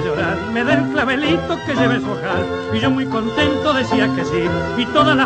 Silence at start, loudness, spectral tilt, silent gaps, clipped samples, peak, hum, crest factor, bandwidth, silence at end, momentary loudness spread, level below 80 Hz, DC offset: 0 s; -18 LUFS; -6 dB/octave; none; under 0.1%; -2 dBFS; none; 16 dB; 9 kHz; 0 s; 5 LU; -42 dBFS; under 0.1%